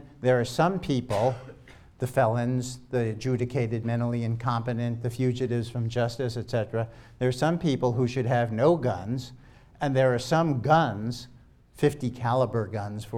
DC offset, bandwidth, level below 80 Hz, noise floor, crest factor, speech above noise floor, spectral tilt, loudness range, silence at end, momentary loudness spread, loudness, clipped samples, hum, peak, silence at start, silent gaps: under 0.1%; 14 kHz; -54 dBFS; -50 dBFS; 20 dB; 24 dB; -7 dB/octave; 3 LU; 0 s; 9 LU; -27 LUFS; under 0.1%; none; -6 dBFS; 0 s; none